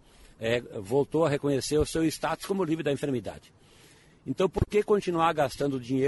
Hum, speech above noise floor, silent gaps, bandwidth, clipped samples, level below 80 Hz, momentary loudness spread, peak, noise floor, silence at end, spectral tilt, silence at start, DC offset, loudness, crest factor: none; 29 dB; none; 11.5 kHz; under 0.1%; -48 dBFS; 7 LU; -12 dBFS; -56 dBFS; 0 s; -5.5 dB/octave; 0.4 s; under 0.1%; -28 LUFS; 16 dB